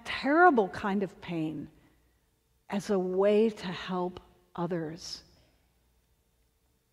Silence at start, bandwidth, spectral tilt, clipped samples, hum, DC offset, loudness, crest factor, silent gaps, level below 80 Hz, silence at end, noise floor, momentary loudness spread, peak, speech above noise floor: 0.05 s; 13 kHz; -6 dB/octave; under 0.1%; none; under 0.1%; -29 LUFS; 22 dB; none; -64 dBFS; 1.75 s; -72 dBFS; 19 LU; -8 dBFS; 43 dB